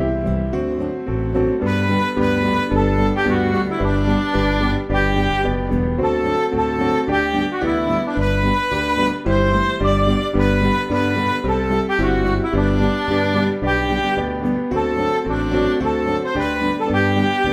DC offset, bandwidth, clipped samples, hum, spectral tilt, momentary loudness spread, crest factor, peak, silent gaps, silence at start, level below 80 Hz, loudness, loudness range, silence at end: under 0.1%; 13.5 kHz; under 0.1%; none; -7 dB/octave; 3 LU; 16 dB; -2 dBFS; none; 0 s; -28 dBFS; -19 LUFS; 1 LU; 0 s